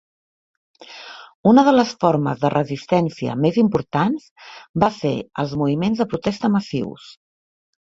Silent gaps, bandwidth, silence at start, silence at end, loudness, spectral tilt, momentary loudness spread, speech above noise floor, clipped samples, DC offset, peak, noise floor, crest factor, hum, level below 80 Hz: 1.35-1.44 s, 4.31-4.36 s, 4.69-4.74 s; 7.8 kHz; 0.8 s; 0.8 s; -19 LUFS; -7 dB/octave; 20 LU; 21 dB; under 0.1%; under 0.1%; -2 dBFS; -39 dBFS; 18 dB; none; -54 dBFS